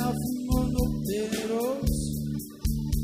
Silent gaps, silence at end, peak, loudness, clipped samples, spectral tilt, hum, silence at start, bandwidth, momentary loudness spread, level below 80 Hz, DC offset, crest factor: none; 0 s; -12 dBFS; -29 LUFS; under 0.1%; -6 dB/octave; none; 0 s; 16 kHz; 5 LU; -34 dBFS; under 0.1%; 14 dB